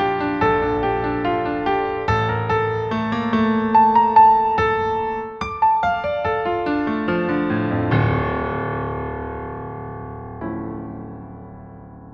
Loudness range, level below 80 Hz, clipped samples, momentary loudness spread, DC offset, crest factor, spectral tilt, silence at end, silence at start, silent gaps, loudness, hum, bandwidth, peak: 10 LU; -40 dBFS; under 0.1%; 18 LU; under 0.1%; 18 dB; -8 dB/octave; 0 s; 0 s; none; -20 LUFS; none; 7 kHz; -2 dBFS